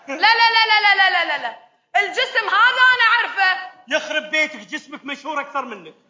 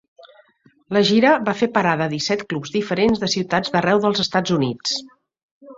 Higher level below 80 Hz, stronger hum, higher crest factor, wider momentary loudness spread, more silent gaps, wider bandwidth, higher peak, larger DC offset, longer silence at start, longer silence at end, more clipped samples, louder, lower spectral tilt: second, -78 dBFS vs -56 dBFS; neither; about the same, 16 dB vs 18 dB; first, 17 LU vs 8 LU; second, none vs 5.43-5.61 s; about the same, 7.6 kHz vs 7.8 kHz; about the same, -2 dBFS vs -2 dBFS; neither; second, 0.1 s vs 0.9 s; first, 0.2 s vs 0.05 s; neither; first, -16 LUFS vs -19 LUFS; second, -0.5 dB/octave vs -4.5 dB/octave